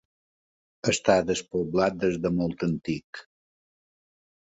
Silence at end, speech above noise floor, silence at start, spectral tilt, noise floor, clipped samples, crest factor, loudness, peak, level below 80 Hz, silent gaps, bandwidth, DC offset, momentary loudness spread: 1.3 s; over 64 dB; 0.85 s; -5 dB/octave; under -90 dBFS; under 0.1%; 22 dB; -26 LUFS; -6 dBFS; -56 dBFS; 3.04-3.13 s; 8.2 kHz; under 0.1%; 11 LU